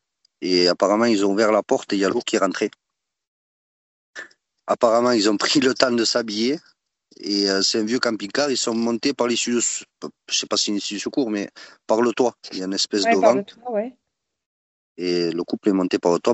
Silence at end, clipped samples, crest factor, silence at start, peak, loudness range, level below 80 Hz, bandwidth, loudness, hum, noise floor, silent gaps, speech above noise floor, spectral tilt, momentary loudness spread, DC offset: 0 s; under 0.1%; 22 dB; 0.4 s; 0 dBFS; 3 LU; -68 dBFS; 8.4 kHz; -21 LUFS; none; -42 dBFS; 3.27-4.14 s, 14.46-14.95 s; 22 dB; -3 dB/octave; 12 LU; under 0.1%